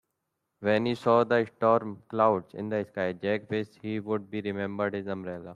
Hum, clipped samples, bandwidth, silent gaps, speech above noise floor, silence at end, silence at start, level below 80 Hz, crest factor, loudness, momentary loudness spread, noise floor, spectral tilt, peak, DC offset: none; under 0.1%; 10.5 kHz; none; 54 dB; 0 s; 0.6 s; -70 dBFS; 18 dB; -29 LUFS; 10 LU; -82 dBFS; -7.5 dB/octave; -10 dBFS; under 0.1%